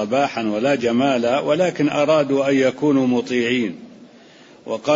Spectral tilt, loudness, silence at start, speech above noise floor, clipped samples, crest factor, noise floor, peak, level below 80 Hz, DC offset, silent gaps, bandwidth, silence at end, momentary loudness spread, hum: -5.5 dB/octave; -19 LUFS; 0 s; 28 dB; under 0.1%; 14 dB; -46 dBFS; -4 dBFS; -64 dBFS; under 0.1%; none; 7.8 kHz; 0 s; 6 LU; none